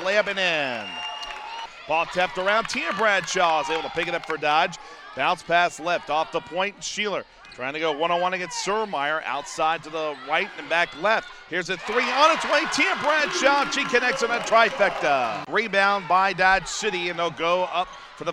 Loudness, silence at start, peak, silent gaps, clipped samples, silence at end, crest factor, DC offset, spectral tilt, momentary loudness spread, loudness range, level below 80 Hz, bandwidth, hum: -23 LUFS; 0 s; -6 dBFS; none; under 0.1%; 0 s; 18 dB; under 0.1%; -2.5 dB/octave; 10 LU; 5 LU; -56 dBFS; 13.5 kHz; none